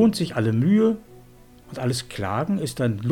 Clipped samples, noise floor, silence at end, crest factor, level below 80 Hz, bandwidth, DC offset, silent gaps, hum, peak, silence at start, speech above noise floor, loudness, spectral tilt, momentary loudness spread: under 0.1%; -49 dBFS; 0 s; 14 dB; -52 dBFS; 17 kHz; under 0.1%; none; none; -8 dBFS; 0 s; 27 dB; -23 LUFS; -6.5 dB/octave; 10 LU